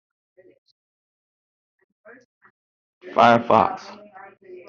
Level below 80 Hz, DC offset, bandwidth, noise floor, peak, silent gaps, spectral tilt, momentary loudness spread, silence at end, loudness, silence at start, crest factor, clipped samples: -66 dBFS; under 0.1%; 7.4 kHz; under -90 dBFS; -2 dBFS; none; -3.5 dB/octave; 26 LU; 0.15 s; -18 LUFS; 3.05 s; 22 dB; under 0.1%